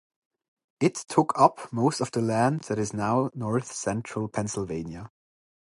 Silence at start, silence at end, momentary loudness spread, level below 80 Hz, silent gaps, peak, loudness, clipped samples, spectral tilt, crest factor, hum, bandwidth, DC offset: 0.8 s; 0.65 s; 9 LU; -58 dBFS; none; -4 dBFS; -27 LUFS; under 0.1%; -6 dB/octave; 24 dB; none; 11.5 kHz; under 0.1%